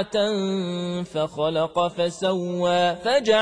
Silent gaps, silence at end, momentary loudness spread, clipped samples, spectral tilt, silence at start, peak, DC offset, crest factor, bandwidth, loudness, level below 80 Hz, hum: none; 0 s; 6 LU; under 0.1%; -5 dB/octave; 0 s; -8 dBFS; under 0.1%; 16 dB; 10.5 kHz; -23 LUFS; -60 dBFS; none